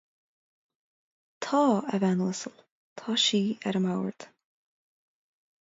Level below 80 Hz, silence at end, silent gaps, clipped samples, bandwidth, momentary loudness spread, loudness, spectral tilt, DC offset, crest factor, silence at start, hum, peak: -76 dBFS; 1.35 s; 2.72-2.96 s; under 0.1%; 7.8 kHz; 14 LU; -27 LUFS; -4.5 dB/octave; under 0.1%; 18 dB; 1.4 s; none; -12 dBFS